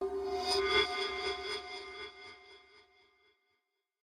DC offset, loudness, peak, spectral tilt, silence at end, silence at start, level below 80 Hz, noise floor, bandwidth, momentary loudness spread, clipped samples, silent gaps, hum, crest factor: under 0.1%; -34 LUFS; -16 dBFS; -2 dB/octave; 1.25 s; 0 s; -62 dBFS; -83 dBFS; 14 kHz; 21 LU; under 0.1%; none; none; 22 dB